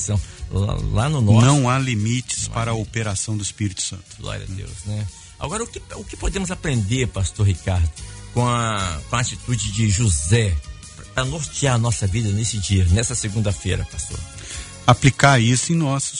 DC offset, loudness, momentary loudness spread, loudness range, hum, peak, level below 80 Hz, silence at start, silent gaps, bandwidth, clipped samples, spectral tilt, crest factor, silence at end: under 0.1%; -21 LUFS; 15 LU; 7 LU; none; 0 dBFS; -34 dBFS; 0 s; none; 11 kHz; under 0.1%; -4.5 dB/octave; 20 dB; 0 s